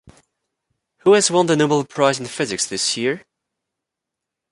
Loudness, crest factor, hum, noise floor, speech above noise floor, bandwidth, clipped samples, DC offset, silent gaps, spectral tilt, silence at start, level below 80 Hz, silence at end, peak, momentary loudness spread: -18 LUFS; 18 dB; none; -83 dBFS; 66 dB; 11.5 kHz; under 0.1%; under 0.1%; none; -3.5 dB/octave; 1.05 s; -62 dBFS; 1.3 s; -2 dBFS; 9 LU